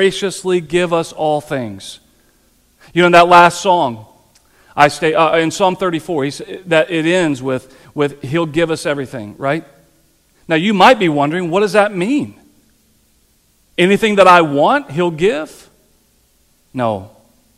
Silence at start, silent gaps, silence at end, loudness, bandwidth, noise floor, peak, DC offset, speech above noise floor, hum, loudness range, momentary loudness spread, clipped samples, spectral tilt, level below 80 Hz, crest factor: 0 s; none; 0.5 s; -14 LUFS; 15 kHz; -56 dBFS; 0 dBFS; under 0.1%; 42 dB; none; 5 LU; 15 LU; under 0.1%; -5 dB/octave; -50 dBFS; 16 dB